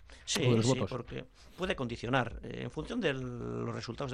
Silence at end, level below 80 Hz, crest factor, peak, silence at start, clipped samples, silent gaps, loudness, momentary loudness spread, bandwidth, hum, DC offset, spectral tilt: 0 s; -54 dBFS; 18 dB; -16 dBFS; 0 s; under 0.1%; none; -34 LUFS; 13 LU; 13 kHz; none; under 0.1%; -5 dB/octave